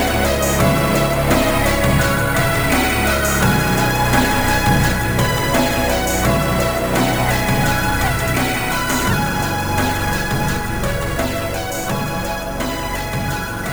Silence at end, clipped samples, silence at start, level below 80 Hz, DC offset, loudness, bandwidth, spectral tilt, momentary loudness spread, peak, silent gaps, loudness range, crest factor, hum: 0 s; under 0.1%; 0 s; -26 dBFS; 1%; -17 LUFS; over 20 kHz; -4.5 dB/octave; 7 LU; -2 dBFS; none; 5 LU; 14 dB; none